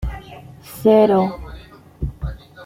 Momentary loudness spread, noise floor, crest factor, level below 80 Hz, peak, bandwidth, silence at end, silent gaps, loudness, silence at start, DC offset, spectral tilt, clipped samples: 24 LU; -40 dBFS; 18 dB; -34 dBFS; -2 dBFS; 16.5 kHz; 0 s; none; -17 LUFS; 0 s; under 0.1%; -7.5 dB/octave; under 0.1%